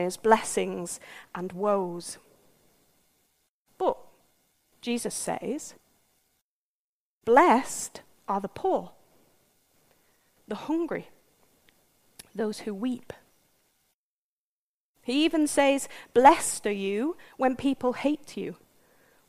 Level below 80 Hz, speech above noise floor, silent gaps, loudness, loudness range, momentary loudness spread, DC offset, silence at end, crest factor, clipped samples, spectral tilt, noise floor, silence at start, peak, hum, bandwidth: -62 dBFS; over 64 dB; 3.49-3.65 s, 6.42-7.21 s, 13.94-14.94 s; -27 LUFS; 13 LU; 19 LU; under 0.1%; 0.75 s; 26 dB; under 0.1%; -3.5 dB/octave; under -90 dBFS; 0 s; -4 dBFS; none; 15.5 kHz